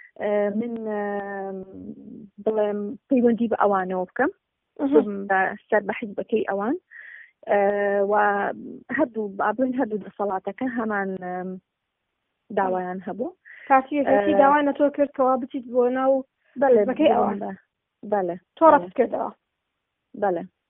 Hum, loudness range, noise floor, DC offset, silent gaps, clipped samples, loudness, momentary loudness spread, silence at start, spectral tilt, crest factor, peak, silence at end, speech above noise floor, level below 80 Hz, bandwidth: none; 7 LU; -79 dBFS; under 0.1%; none; under 0.1%; -23 LUFS; 14 LU; 0.2 s; -1 dB/octave; 20 dB; -4 dBFS; 0.2 s; 57 dB; -66 dBFS; 3.7 kHz